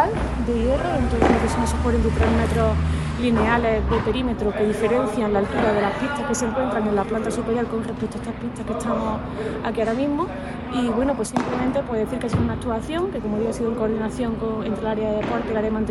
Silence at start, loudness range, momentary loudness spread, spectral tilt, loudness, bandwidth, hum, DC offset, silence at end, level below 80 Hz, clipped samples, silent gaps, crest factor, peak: 0 s; 5 LU; 7 LU; -6.5 dB/octave; -23 LUFS; 12 kHz; none; under 0.1%; 0 s; -32 dBFS; under 0.1%; none; 18 dB; -4 dBFS